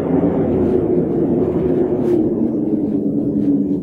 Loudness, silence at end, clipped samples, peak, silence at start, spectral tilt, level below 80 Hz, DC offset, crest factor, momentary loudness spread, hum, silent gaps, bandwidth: -17 LUFS; 0 s; under 0.1%; -4 dBFS; 0 s; -11.5 dB/octave; -40 dBFS; under 0.1%; 12 dB; 2 LU; none; none; 3.9 kHz